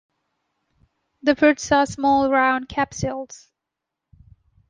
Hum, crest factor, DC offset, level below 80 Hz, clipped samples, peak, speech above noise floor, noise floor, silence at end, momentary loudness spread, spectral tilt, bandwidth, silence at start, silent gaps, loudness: none; 20 dB; under 0.1%; -50 dBFS; under 0.1%; -4 dBFS; 64 dB; -84 dBFS; 1.35 s; 11 LU; -4.5 dB/octave; 9.6 kHz; 1.25 s; none; -20 LUFS